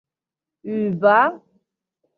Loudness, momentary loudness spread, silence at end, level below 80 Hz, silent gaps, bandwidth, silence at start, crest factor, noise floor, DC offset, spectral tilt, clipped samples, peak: -19 LUFS; 14 LU; 0.8 s; -72 dBFS; none; 4.9 kHz; 0.65 s; 20 dB; -88 dBFS; under 0.1%; -9 dB/octave; under 0.1%; -4 dBFS